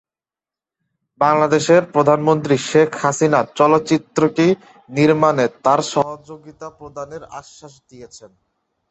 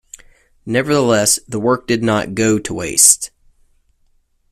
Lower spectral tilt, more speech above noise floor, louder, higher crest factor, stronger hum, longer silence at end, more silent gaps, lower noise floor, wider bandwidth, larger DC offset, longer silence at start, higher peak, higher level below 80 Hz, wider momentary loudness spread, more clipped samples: first, -5.5 dB/octave vs -3 dB/octave; first, over 73 dB vs 43 dB; about the same, -16 LUFS vs -14 LUFS; about the same, 16 dB vs 18 dB; neither; second, 0.65 s vs 1.25 s; neither; first, under -90 dBFS vs -58 dBFS; second, 8.4 kHz vs 15.5 kHz; neither; first, 1.2 s vs 0.65 s; about the same, -2 dBFS vs 0 dBFS; second, -60 dBFS vs -48 dBFS; first, 19 LU vs 10 LU; neither